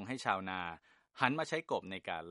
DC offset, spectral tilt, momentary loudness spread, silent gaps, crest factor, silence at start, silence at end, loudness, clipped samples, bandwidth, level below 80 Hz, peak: under 0.1%; -4.5 dB/octave; 9 LU; none; 28 dB; 0 s; 0 s; -37 LUFS; under 0.1%; 11.5 kHz; -74 dBFS; -10 dBFS